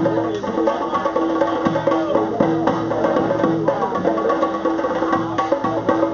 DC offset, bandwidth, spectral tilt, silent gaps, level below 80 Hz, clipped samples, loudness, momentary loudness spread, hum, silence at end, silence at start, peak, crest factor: under 0.1%; 7 kHz; -5.5 dB/octave; none; -50 dBFS; under 0.1%; -19 LUFS; 2 LU; none; 0 s; 0 s; 0 dBFS; 18 dB